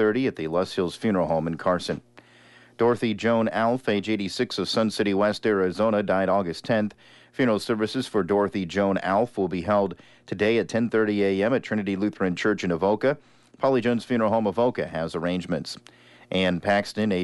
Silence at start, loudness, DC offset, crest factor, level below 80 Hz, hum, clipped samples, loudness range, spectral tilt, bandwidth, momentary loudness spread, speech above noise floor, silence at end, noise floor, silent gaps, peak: 0 s; -24 LUFS; under 0.1%; 14 dB; -60 dBFS; none; under 0.1%; 2 LU; -6 dB/octave; 11.5 kHz; 6 LU; 29 dB; 0 s; -53 dBFS; none; -10 dBFS